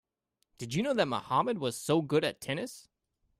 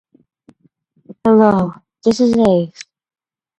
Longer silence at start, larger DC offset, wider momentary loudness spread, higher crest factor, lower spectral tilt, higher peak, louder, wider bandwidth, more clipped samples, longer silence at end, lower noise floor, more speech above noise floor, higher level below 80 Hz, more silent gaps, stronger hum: second, 0.6 s vs 1.1 s; neither; about the same, 12 LU vs 10 LU; about the same, 20 dB vs 16 dB; second, -5 dB/octave vs -7 dB/octave; second, -14 dBFS vs 0 dBFS; second, -31 LUFS vs -14 LUFS; first, 15.5 kHz vs 8.8 kHz; neither; second, 0.6 s vs 0.75 s; first, -81 dBFS vs -58 dBFS; first, 50 dB vs 45 dB; second, -70 dBFS vs -50 dBFS; neither; neither